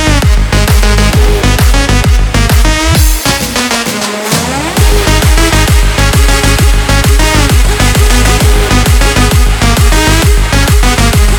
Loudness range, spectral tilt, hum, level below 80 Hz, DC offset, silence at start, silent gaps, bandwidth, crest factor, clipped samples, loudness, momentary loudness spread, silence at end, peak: 1 LU; -4 dB/octave; none; -10 dBFS; under 0.1%; 0 s; none; 20 kHz; 6 dB; 0.3%; -8 LUFS; 3 LU; 0 s; 0 dBFS